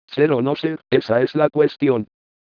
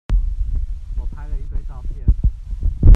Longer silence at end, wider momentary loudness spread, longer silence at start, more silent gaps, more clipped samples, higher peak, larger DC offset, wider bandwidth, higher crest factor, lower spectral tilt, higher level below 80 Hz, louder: first, 0.5 s vs 0 s; second, 7 LU vs 11 LU; about the same, 0.1 s vs 0.1 s; neither; neither; about the same, -2 dBFS vs 0 dBFS; neither; first, 5.4 kHz vs 1.9 kHz; about the same, 16 dB vs 16 dB; second, -8.5 dB/octave vs -10 dB/octave; second, -66 dBFS vs -18 dBFS; first, -19 LUFS vs -25 LUFS